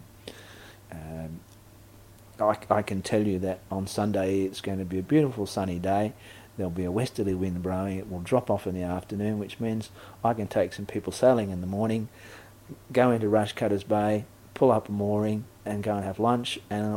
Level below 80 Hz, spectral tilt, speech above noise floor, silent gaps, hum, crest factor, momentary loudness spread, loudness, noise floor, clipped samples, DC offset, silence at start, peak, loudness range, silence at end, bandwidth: -56 dBFS; -6.5 dB/octave; 25 dB; none; none; 22 dB; 20 LU; -28 LUFS; -52 dBFS; under 0.1%; under 0.1%; 0 s; -6 dBFS; 4 LU; 0 s; 16.5 kHz